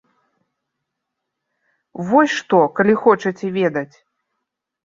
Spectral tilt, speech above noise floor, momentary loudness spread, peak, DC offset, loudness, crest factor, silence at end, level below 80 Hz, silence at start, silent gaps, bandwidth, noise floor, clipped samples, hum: -6 dB/octave; 62 dB; 15 LU; -2 dBFS; under 0.1%; -17 LUFS; 18 dB; 1 s; -64 dBFS; 1.95 s; none; 7.6 kHz; -79 dBFS; under 0.1%; none